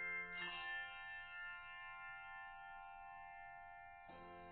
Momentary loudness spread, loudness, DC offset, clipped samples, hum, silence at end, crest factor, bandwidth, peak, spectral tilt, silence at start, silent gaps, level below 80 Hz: 12 LU; -51 LUFS; under 0.1%; under 0.1%; none; 0 s; 16 dB; 4.3 kHz; -36 dBFS; 0.5 dB/octave; 0 s; none; -72 dBFS